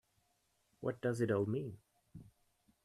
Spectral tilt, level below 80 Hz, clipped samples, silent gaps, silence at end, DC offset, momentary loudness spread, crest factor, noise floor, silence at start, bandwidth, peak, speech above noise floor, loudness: -7.5 dB/octave; -74 dBFS; under 0.1%; none; 0.6 s; under 0.1%; 24 LU; 20 dB; -79 dBFS; 0.8 s; 13.5 kHz; -22 dBFS; 42 dB; -38 LUFS